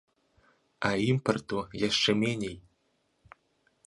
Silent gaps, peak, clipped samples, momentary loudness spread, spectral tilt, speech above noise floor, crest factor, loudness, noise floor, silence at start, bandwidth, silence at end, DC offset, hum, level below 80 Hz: none; -10 dBFS; under 0.1%; 10 LU; -5 dB/octave; 45 dB; 22 dB; -29 LUFS; -74 dBFS; 0.8 s; 11.5 kHz; 1.25 s; under 0.1%; none; -60 dBFS